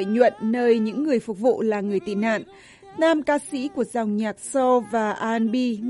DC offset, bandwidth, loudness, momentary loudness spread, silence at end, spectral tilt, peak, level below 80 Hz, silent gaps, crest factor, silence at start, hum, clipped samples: under 0.1%; 11.5 kHz; -23 LUFS; 6 LU; 0 s; -5.5 dB/octave; -4 dBFS; -64 dBFS; none; 18 dB; 0 s; none; under 0.1%